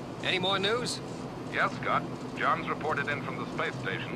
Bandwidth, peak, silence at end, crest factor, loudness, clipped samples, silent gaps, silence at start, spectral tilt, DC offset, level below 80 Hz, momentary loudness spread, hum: 13 kHz; -14 dBFS; 0 s; 18 dB; -30 LUFS; under 0.1%; none; 0 s; -4.5 dB/octave; under 0.1%; -58 dBFS; 8 LU; none